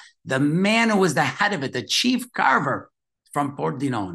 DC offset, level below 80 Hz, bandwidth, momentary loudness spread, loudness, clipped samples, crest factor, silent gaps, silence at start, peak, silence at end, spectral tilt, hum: under 0.1%; -68 dBFS; 12.5 kHz; 9 LU; -22 LUFS; under 0.1%; 18 dB; none; 0.25 s; -4 dBFS; 0 s; -4.5 dB/octave; none